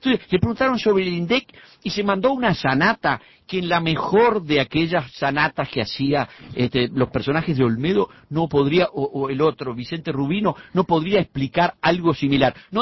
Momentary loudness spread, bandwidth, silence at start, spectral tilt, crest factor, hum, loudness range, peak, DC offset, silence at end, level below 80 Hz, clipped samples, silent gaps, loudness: 7 LU; 6 kHz; 0.05 s; -7 dB/octave; 18 dB; none; 2 LU; -2 dBFS; under 0.1%; 0 s; -48 dBFS; under 0.1%; none; -21 LUFS